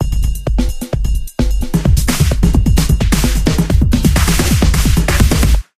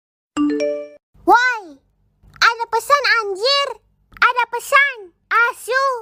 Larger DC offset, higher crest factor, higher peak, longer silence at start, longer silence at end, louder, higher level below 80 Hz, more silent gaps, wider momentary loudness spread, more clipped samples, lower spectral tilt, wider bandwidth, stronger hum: neither; second, 12 dB vs 18 dB; about the same, 0 dBFS vs -2 dBFS; second, 0 s vs 0.35 s; first, 0.2 s vs 0 s; first, -14 LUFS vs -17 LUFS; first, -14 dBFS vs -58 dBFS; second, none vs 1.03-1.13 s; second, 6 LU vs 11 LU; neither; first, -5 dB/octave vs -1 dB/octave; about the same, 16 kHz vs 16 kHz; neither